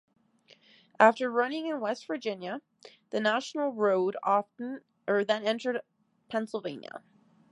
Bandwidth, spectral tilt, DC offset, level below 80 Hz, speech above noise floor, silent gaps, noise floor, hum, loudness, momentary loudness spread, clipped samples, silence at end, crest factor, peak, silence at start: 11 kHz; -4.5 dB/octave; under 0.1%; -84 dBFS; 33 dB; none; -62 dBFS; none; -30 LUFS; 16 LU; under 0.1%; 0.55 s; 24 dB; -6 dBFS; 1 s